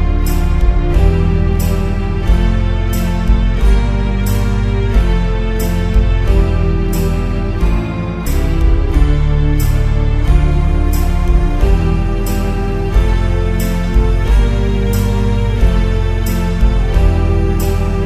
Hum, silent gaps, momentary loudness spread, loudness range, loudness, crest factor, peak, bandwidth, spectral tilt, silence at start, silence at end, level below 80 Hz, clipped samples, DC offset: none; none; 3 LU; 1 LU; -15 LUFS; 12 dB; 0 dBFS; 14 kHz; -7 dB/octave; 0 s; 0 s; -14 dBFS; under 0.1%; under 0.1%